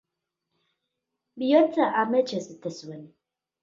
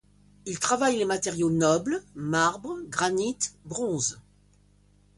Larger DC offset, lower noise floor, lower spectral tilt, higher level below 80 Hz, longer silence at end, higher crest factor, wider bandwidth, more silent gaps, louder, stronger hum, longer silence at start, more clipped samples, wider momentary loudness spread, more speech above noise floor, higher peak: neither; first, -83 dBFS vs -60 dBFS; first, -5.5 dB/octave vs -4 dB/octave; second, -80 dBFS vs -60 dBFS; second, 0.55 s vs 0.95 s; about the same, 20 dB vs 20 dB; second, 7.6 kHz vs 11.5 kHz; neither; first, -24 LUFS vs -27 LUFS; second, none vs 50 Hz at -50 dBFS; first, 1.35 s vs 0.45 s; neither; first, 20 LU vs 9 LU; first, 59 dB vs 34 dB; about the same, -6 dBFS vs -8 dBFS